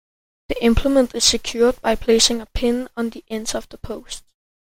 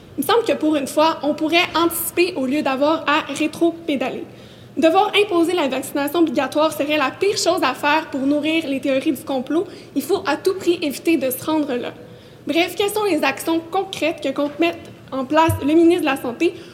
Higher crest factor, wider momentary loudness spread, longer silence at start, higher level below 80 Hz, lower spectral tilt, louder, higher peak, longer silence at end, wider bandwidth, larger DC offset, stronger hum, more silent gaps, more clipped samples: about the same, 18 dB vs 16 dB; first, 17 LU vs 7 LU; first, 0.5 s vs 0 s; first, -34 dBFS vs -56 dBFS; about the same, -3 dB/octave vs -4 dB/octave; about the same, -19 LUFS vs -19 LUFS; about the same, -2 dBFS vs -4 dBFS; first, 0.5 s vs 0 s; about the same, 16.5 kHz vs 17 kHz; neither; neither; neither; neither